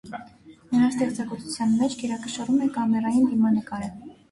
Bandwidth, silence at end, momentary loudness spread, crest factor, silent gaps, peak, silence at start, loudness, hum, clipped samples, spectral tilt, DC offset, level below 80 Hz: 11.5 kHz; 0.2 s; 13 LU; 14 dB; none; -10 dBFS; 0.05 s; -24 LUFS; none; under 0.1%; -5.5 dB/octave; under 0.1%; -60 dBFS